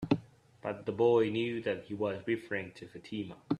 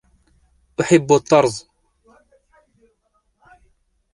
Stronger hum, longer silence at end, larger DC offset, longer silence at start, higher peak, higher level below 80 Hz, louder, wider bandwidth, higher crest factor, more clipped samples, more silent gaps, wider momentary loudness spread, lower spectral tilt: neither; second, 0 s vs 2.55 s; neither; second, 0 s vs 0.8 s; second, -12 dBFS vs -2 dBFS; second, -68 dBFS vs -58 dBFS; second, -33 LUFS vs -16 LUFS; about the same, 10.5 kHz vs 11.5 kHz; about the same, 22 dB vs 20 dB; neither; neither; about the same, 15 LU vs 17 LU; first, -7.5 dB/octave vs -5.5 dB/octave